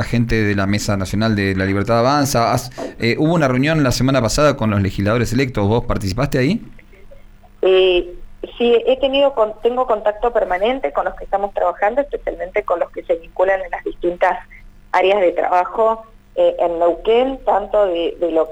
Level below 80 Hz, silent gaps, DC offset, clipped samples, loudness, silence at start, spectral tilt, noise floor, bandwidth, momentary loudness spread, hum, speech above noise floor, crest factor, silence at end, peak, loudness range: -36 dBFS; none; under 0.1%; under 0.1%; -17 LUFS; 0 s; -5.5 dB/octave; -41 dBFS; 19 kHz; 7 LU; none; 24 dB; 14 dB; 0 s; -4 dBFS; 3 LU